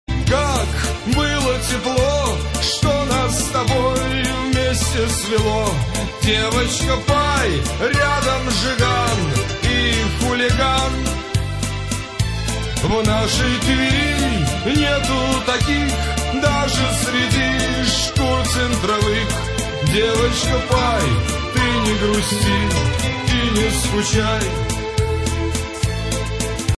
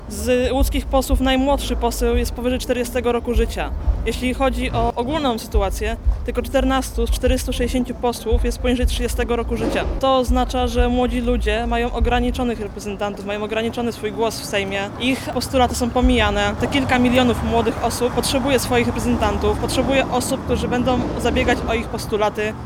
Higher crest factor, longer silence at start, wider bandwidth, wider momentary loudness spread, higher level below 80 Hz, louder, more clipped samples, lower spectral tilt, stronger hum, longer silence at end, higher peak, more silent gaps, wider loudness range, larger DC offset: about the same, 14 dB vs 16 dB; about the same, 0.1 s vs 0 s; second, 11 kHz vs 17 kHz; about the same, 5 LU vs 6 LU; about the same, -26 dBFS vs -26 dBFS; about the same, -18 LUFS vs -20 LUFS; neither; about the same, -4 dB/octave vs -5 dB/octave; neither; about the same, 0 s vs 0 s; about the same, -4 dBFS vs -4 dBFS; neither; about the same, 2 LU vs 3 LU; neither